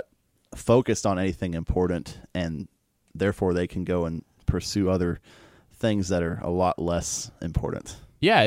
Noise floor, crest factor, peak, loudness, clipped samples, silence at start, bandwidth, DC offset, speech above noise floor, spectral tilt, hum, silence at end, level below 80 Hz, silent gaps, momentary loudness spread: -64 dBFS; 20 dB; -6 dBFS; -27 LUFS; under 0.1%; 0.5 s; 16 kHz; under 0.1%; 38 dB; -5.5 dB/octave; none; 0 s; -42 dBFS; none; 13 LU